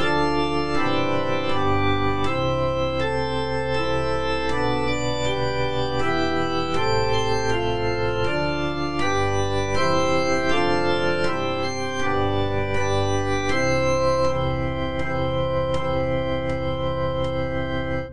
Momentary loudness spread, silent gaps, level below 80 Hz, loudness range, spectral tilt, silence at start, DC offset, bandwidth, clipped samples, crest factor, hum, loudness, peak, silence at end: 4 LU; none; -38 dBFS; 2 LU; -5.5 dB/octave; 0 s; 4%; 10 kHz; under 0.1%; 14 dB; none; -23 LUFS; -8 dBFS; 0 s